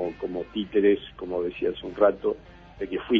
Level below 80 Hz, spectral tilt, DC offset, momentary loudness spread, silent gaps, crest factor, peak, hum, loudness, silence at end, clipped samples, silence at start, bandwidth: -52 dBFS; -8 dB/octave; under 0.1%; 11 LU; none; 20 dB; -6 dBFS; 50 Hz at -55 dBFS; -26 LUFS; 0 s; under 0.1%; 0 s; 4.9 kHz